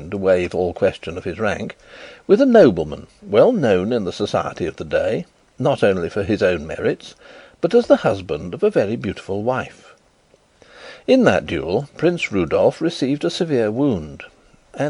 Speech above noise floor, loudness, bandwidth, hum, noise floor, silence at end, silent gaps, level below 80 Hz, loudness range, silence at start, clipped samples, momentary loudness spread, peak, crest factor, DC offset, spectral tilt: 38 dB; -19 LUFS; 11 kHz; none; -56 dBFS; 0 s; none; -48 dBFS; 4 LU; 0 s; under 0.1%; 16 LU; -2 dBFS; 18 dB; under 0.1%; -6.5 dB/octave